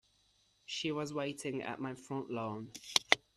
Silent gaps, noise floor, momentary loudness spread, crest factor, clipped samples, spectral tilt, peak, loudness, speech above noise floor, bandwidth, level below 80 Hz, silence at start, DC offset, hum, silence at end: none; -72 dBFS; 12 LU; 34 dB; under 0.1%; -3 dB/octave; -4 dBFS; -37 LUFS; 34 dB; 14 kHz; -76 dBFS; 0.7 s; under 0.1%; none; 0.2 s